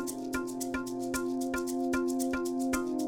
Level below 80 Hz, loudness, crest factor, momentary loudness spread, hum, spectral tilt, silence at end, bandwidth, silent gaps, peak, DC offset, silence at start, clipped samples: -54 dBFS; -33 LUFS; 14 dB; 4 LU; none; -4 dB/octave; 0 s; 19 kHz; none; -18 dBFS; under 0.1%; 0 s; under 0.1%